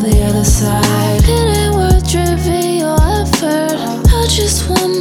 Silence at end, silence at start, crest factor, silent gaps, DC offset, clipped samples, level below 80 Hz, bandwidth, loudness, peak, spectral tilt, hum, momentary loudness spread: 0 s; 0 s; 12 dB; none; under 0.1%; under 0.1%; -16 dBFS; 17.5 kHz; -13 LUFS; 0 dBFS; -5 dB/octave; none; 3 LU